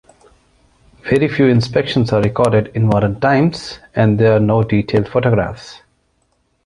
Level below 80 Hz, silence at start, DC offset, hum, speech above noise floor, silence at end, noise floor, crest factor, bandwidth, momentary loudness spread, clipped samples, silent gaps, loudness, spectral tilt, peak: -42 dBFS; 1.05 s; under 0.1%; none; 48 dB; 0.9 s; -63 dBFS; 14 dB; 11 kHz; 11 LU; under 0.1%; none; -15 LUFS; -7.5 dB/octave; 0 dBFS